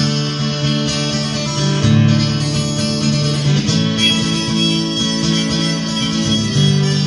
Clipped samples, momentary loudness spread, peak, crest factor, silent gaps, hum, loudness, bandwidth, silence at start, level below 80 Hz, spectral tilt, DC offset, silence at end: under 0.1%; 4 LU; -2 dBFS; 14 dB; none; none; -15 LUFS; 11.5 kHz; 0 s; -40 dBFS; -4.5 dB/octave; under 0.1%; 0 s